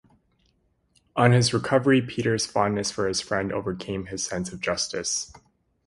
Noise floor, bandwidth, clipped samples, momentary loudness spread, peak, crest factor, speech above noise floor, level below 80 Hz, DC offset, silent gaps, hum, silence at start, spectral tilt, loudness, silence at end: -68 dBFS; 11.5 kHz; under 0.1%; 10 LU; -4 dBFS; 22 dB; 44 dB; -54 dBFS; under 0.1%; none; none; 1.15 s; -4.5 dB/octave; -24 LUFS; 0.55 s